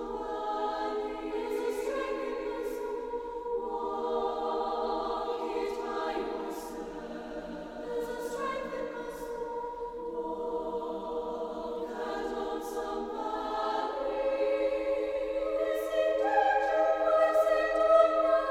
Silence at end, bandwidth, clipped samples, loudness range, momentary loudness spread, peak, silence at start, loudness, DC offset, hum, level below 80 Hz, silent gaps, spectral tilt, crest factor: 0 s; 16.5 kHz; under 0.1%; 9 LU; 11 LU; -10 dBFS; 0 s; -32 LUFS; under 0.1%; none; -58 dBFS; none; -4 dB/octave; 20 dB